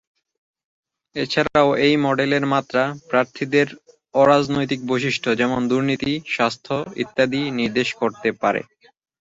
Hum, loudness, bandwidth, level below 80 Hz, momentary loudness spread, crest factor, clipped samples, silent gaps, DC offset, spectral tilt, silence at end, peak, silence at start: none; -20 LUFS; 7.8 kHz; -56 dBFS; 9 LU; 18 dB; under 0.1%; none; under 0.1%; -5.5 dB/octave; 0.6 s; -4 dBFS; 1.15 s